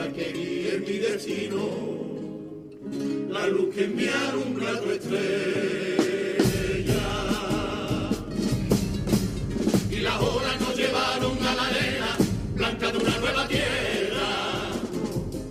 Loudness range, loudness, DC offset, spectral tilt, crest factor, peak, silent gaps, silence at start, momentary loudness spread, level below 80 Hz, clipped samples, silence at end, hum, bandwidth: 4 LU; -26 LUFS; under 0.1%; -5 dB/octave; 18 dB; -8 dBFS; none; 0 s; 6 LU; -42 dBFS; under 0.1%; 0 s; none; 15.5 kHz